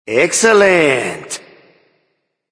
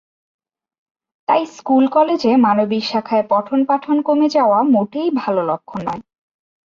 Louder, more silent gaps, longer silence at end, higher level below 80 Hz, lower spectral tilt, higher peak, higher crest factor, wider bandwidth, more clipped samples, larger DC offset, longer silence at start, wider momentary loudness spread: first, -12 LUFS vs -16 LUFS; neither; first, 1.15 s vs 0.65 s; about the same, -58 dBFS vs -62 dBFS; second, -3 dB/octave vs -6.5 dB/octave; first, 0 dBFS vs -4 dBFS; about the same, 16 dB vs 14 dB; first, 10.5 kHz vs 7.4 kHz; neither; neither; second, 0.05 s vs 1.3 s; first, 18 LU vs 10 LU